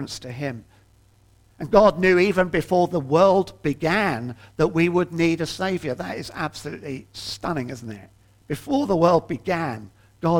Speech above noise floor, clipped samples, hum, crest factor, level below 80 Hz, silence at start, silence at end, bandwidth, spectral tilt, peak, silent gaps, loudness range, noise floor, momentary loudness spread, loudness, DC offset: 34 dB; under 0.1%; none; 20 dB; -48 dBFS; 0 s; 0 s; 16.5 kHz; -6 dB/octave; -2 dBFS; none; 8 LU; -56 dBFS; 17 LU; -22 LUFS; under 0.1%